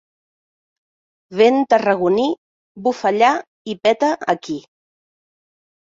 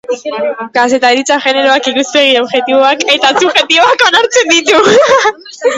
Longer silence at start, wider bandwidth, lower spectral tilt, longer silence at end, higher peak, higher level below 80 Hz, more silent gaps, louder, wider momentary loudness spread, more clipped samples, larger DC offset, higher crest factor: first, 1.3 s vs 0.1 s; second, 7.6 kHz vs 11 kHz; first, -5 dB/octave vs -1.5 dB/octave; first, 1.35 s vs 0 s; about the same, -2 dBFS vs 0 dBFS; second, -66 dBFS vs -56 dBFS; first, 2.38-2.75 s, 3.47-3.65 s vs none; second, -17 LUFS vs -8 LUFS; first, 15 LU vs 8 LU; second, under 0.1% vs 0.3%; neither; first, 18 dB vs 10 dB